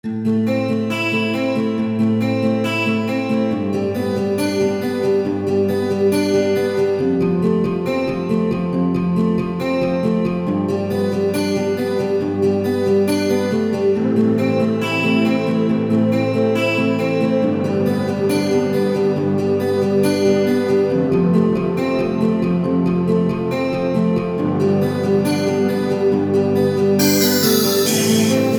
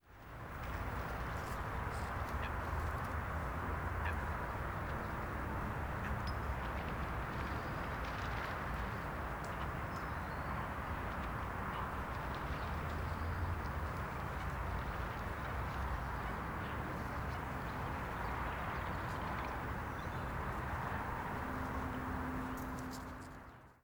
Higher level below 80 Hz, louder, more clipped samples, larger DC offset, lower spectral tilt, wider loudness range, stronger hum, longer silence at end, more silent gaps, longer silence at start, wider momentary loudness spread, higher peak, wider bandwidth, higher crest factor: second, -52 dBFS vs -46 dBFS; first, -18 LUFS vs -41 LUFS; neither; neither; about the same, -6 dB/octave vs -6.5 dB/octave; about the same, 2 LU vs 1 LU; neither; about the same, 0 s vs 0.1 s; neither; about the same, 0.05 s vs 0.05 s; about the same, 4 LU vs 2 LU; first, -2 dBFS vs -26 dBFS; about the same, over 20 kHz vs over 20 kHz; about the same, 16 dB vs 16 dB